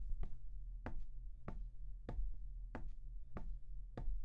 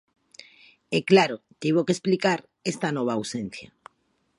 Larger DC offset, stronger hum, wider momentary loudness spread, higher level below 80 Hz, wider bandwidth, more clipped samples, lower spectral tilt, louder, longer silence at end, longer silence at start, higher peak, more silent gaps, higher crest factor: neither; neither; second, 5 LU vs 13 LU; first, -46 dBFS vs -68 dBFS; second, 3.7 kHz vs 11.5 kHz; neither; first, -8.5 dB/octave vs -5 dB/octave; second, -53 LUFS vs -24 LUFS; second, 0 s vs 0.75 s; second, 0 s vs 0.9 s; second, -30 dBFS vs -4 dBFS; neither; second, 14 dB vs 22 dB